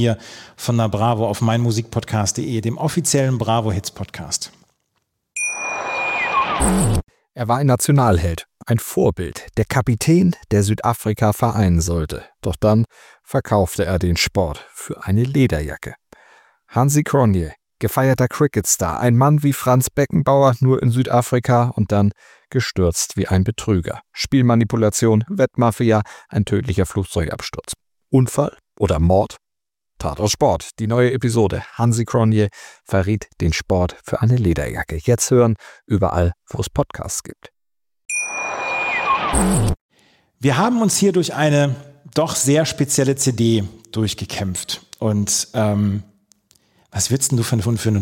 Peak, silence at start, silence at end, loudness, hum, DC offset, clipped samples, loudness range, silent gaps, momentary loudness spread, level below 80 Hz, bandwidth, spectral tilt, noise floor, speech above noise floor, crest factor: -2 dBFS; 0 s; 0 s; -19 LUFS; none; under 0.1%; under 0.1%; 4 LU; 39.81-39.89 s; 10 LU; -36 dBFS; 17 kHz; -5.5 dB/octave; under -90 dBFS; over 72 dB; 16 dB